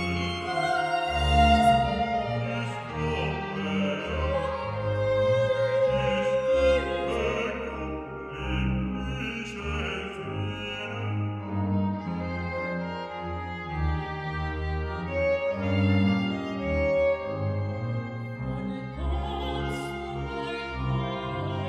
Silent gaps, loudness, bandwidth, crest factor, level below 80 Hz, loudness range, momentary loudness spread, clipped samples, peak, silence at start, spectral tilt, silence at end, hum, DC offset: none; -28 LUFS; 11.5 kHz; 18 dB; -38 dBFS; 6 LU; 10 LU; under 0.1%; -8 dBFS; 0 s; -6.5 dB/octave; 0 s; none; under 0.1%